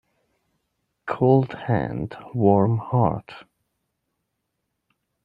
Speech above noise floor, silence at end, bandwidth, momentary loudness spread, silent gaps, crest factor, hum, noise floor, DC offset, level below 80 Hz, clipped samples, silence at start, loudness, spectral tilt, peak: 57 dB; 1.85 s; 4.9 kHz; 13 LU; none; 22 dB; none; -78 dBFS; under 0.1%; -56 dBFS; under 0.1%; 1.05 s; -22 LUFS; -10.5 dB/octave; -4 dBFS